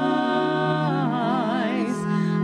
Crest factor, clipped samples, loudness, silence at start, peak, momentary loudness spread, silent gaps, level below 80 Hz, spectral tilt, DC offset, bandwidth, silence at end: 12 dB; under 0.1%; -23 LUFS; 0 s; -12 dBFS; 2 LU; none; -66 dBFS; -7 dB/octave; under 0.1%; 10.5 kHz; 0 s